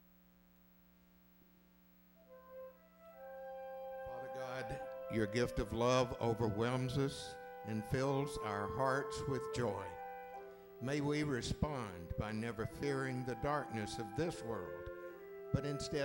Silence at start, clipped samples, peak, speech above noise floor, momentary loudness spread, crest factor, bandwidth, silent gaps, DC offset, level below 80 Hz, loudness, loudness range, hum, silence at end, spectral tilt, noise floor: 2.2 s; under 0.1%; -20 dBFS; 28 dB; 15 LU; 20 dB; 16 kHz; none; under 0.1%; -58 dBFS; -40 LUFS; 12 LU; 60 Hz at -65 dBFS; 0 s; -6 dB/octave; -67 dBFS